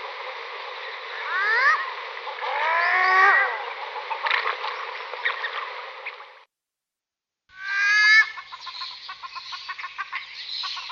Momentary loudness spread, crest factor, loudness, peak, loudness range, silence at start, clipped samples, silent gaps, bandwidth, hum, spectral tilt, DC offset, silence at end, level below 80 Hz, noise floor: 19 LU; 20 dB; -22 LUFS; -6 dBFS; 8 LU; 0 s; under 0.1%; none; 7.2 kHz; none; 1.5 dB/octave; under 0.1%; 0 s; -80 dBFS; -88 dBFS